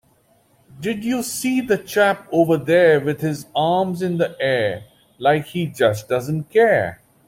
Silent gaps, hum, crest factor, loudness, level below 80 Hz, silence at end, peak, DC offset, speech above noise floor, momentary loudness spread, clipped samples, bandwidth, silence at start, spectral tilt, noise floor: none; none; 16 dB; -19 LUFS; -58 dBFS; 0.35 s; -2 dBFS; under 0.1%; 40 dB; 9 LU; under 0.1%; 16.5 kHz; 0.75 s; -5.5 dB/octave; -58 dBFS